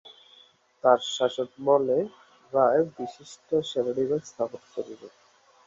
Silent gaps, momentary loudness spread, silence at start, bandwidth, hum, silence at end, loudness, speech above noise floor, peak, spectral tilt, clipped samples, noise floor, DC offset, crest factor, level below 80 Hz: none; 15 LU; 0.85 s; 7.8 kHz; none; 0.6 s; -26 LUFS; 32 dB; -6 dBFS; -5 dB/octave; under 0.1%; -58 dBFS; under 0.1%; 22 dB; -72 dBFS